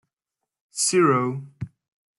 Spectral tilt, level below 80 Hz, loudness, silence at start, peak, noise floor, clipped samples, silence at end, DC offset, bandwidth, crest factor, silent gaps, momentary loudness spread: -4 dB/octave; -64 dBFS; -21 LUFS; 0.75 s; -8 dBFS; -85 dBFS; under 0.1%; 0.5 s; under 0.1%; 12 kHz; 18 dB; none; 20 LU